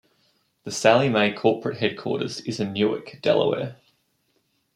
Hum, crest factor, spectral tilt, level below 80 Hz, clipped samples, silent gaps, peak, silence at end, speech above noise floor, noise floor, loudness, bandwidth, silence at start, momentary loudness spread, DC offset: none; 22 dB; -5 dB/octave; -68 dBFS; under 0.1%; none; -2 dBFS; 1 s; 47 dB; -70 dBFS; -23 LUFS; 13 kHz; 0.65 s; 11 LU; under 0.1%